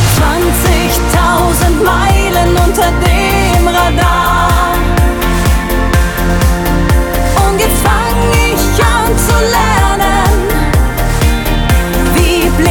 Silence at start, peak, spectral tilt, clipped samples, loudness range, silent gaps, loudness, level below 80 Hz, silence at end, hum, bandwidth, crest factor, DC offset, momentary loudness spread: 0 s; 0 dBFS; -5 dB/octave; under 0.1%; 2 LU; none; -10 LUFS; -14 dBFS; 0 s; none; 19.5 kHz; 10 dB; 0.2%; 2 LU